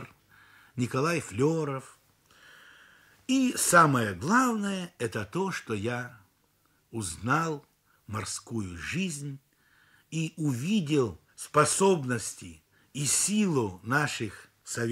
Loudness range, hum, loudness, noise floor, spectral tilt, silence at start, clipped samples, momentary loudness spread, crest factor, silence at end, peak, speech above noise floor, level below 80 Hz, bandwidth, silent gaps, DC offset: 7 LU; none; -28 LUFS; -69 dBFS; -4.5 dB/octave; 0 s; under 0.1%; 17 LU; 22 dB; 0 s; -8 dBFS; 41 dB; -64 dBFS; 16 kHz; none; under 0.1%